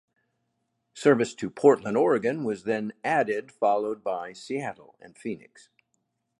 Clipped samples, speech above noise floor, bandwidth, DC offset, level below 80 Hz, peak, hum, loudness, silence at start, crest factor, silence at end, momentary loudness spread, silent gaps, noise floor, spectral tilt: under 0.1%; 51 dB; 11 kHz; under 0.1%; -72 dBFS; -6 dBFS; none; -26 LUFS; 0.95 s; 22 dB; 1.05 s; 15 LU; none; -77 dBFS; -6 dB/octave